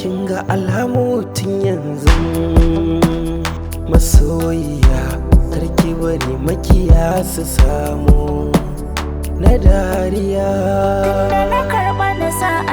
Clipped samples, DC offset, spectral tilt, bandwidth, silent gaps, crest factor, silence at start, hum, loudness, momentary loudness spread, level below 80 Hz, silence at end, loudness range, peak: 0.3%; under 0.1%; -6.5 dB/octave; over 20 kHz; none; 14 dB; 0 s; none; -16 LUFS; 7 LU; -18 dBFS; 0 s; 1 LU; 0 dBFS